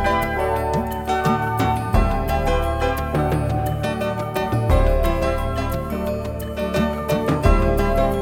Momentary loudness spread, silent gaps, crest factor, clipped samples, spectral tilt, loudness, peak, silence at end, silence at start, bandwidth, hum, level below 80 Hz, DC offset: 6 LU; none; 16 dB; under 0.1%; -6.5 dB/octave; -21 LUFS; -2 dBFS; 0 s; 0 s; 18.5 kHz; none; -24 dBFS; under 0.1%